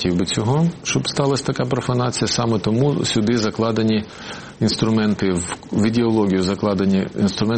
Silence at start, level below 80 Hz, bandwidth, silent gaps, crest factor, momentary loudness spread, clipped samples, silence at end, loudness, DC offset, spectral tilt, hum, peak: 0 s; -48 dBFS; 8.8 kHz; none; 14 dB; 4 LU; under 0.1%; 0 s; -19 LUFS; under 0.1%; -5.5 dB/octave; none; -6 dBFS